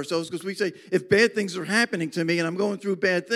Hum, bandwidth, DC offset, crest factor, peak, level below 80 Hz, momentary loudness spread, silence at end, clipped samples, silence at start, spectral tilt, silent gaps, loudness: none; 15 kHz; under 0.1%; 18 dB; -6 dBFS; -68 dBFS; 8 LU; 0 s; under 0.1%; 0 s; -4.5 dB/octave; none; -24 LUFS